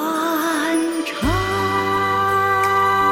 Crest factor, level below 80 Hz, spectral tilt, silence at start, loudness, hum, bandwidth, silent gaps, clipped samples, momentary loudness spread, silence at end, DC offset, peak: 12 dB; -38 dBFS; -4.5 dB/octave; 0 s; -18 LUFS; none; 16.5 kHz; none; under 0.1%; 4 LU; 0 s; under 0.1%; -6 dBFS